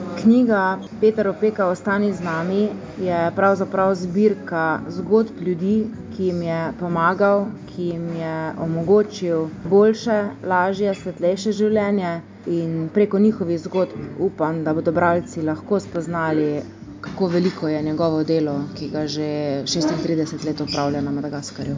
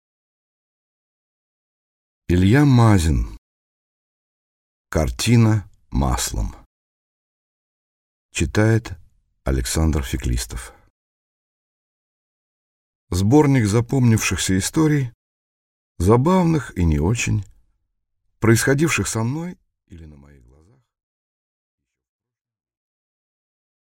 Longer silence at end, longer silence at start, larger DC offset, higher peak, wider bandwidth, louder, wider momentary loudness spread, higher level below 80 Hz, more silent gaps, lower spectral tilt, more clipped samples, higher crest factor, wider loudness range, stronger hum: second, 0 s vs 3.8 s; second, 0 s vs 2.3 s; neither; about the same, -4 dBFS vs -2 dBFS; second, 7.6 kHz vs 16.5 kHz; about the same, -21 LUFS vs -19 LUFS; second, 9 LU vs 14 LU; second, -52 dBFS vs -34 dBFS; second, none vs 3.38-4.85 s, 6.66-8.29 s, 10.90-13.07 s, 15.14-15.95 s; about the same, -6.5 dB/octave vs -5.5 dB/octave; neither; about the same, 16 dB vs 20 dB; second, 3 LU vs 7 LU; neither